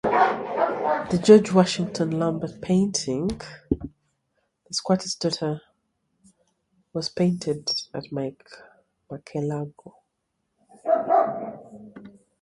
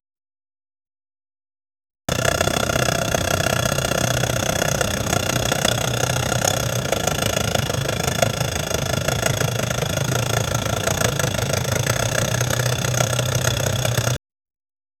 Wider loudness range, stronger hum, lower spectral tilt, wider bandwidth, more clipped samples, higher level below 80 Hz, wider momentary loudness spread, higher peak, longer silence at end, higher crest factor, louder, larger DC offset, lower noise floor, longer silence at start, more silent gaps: first, 9 LU vs 1 LU; neither; first, -5.5 dB/octave vs -3.5 dB/octave; second, 11.5 kHz vs 19 kHz; neither; second, -54 dBFS vs -38 dBFS; first, 16 LU vs 3 LU; about the same, -2 dBFS vs 0 dBFS; second, 0.35 s vs 0.85 s; about the same, 24 dB vs 22 dB; second, -24 LUFS vs -20 LUFS; neither; second, -77 dBFS vs under -90 dBFS; second, 0.05 s vs 2.1 s; neither